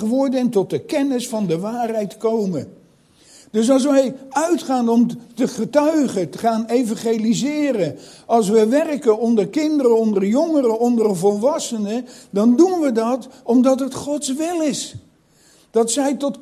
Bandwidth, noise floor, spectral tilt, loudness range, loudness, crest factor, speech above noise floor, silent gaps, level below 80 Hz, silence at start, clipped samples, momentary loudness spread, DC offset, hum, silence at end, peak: 14.5 kHz; -54 dBFS; -5.5 dB/octave; 3 LU; -19 LUFS; 16 dB; 36 dB; none; -64 dBFS; 0 s; under 0.1%; 8 LU; under 0.1%; none; 0.05 s; -2 dBFS